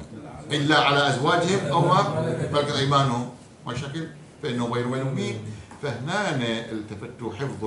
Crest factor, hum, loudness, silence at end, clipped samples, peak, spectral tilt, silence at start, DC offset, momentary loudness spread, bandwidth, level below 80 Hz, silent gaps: 18 dB; none; -24 LUFS; 0 s; under 0.1%; -6 dBFS; -5 dB/octave; 0 s; under 0.1%; 15 LU; 11.5 kHz; -60 dBFS; none